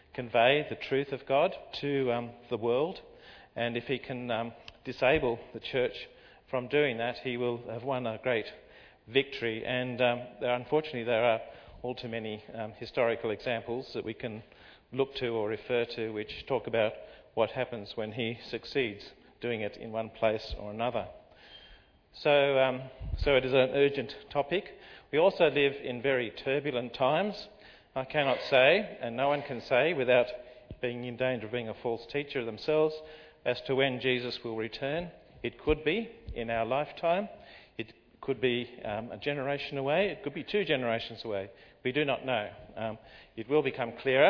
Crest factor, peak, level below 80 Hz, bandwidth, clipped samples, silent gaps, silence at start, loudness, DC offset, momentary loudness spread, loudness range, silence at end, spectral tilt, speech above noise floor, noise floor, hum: 22 dB; -8 dBFS; -54 dBFS; 5.4 kHz; under 0.1%; none; 0.15 s; -31 LUFS; under 0.1%; 14 LU; 6 LU; 0 s; -7 dB/octave; 27 dB; -58 dBFS; none